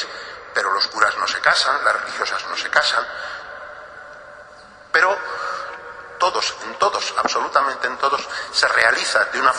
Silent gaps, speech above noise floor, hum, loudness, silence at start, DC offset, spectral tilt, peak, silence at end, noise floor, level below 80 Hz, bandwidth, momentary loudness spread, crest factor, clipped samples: none; 24 dB; none; -19 LUFS; 0 s; under 0.1%; 0 dB/octave; 0 dBFS; 0 s; -43 dBFS; -60 dBFS; 11.5 kHz; 19 LU; 22 dB; under 0.1%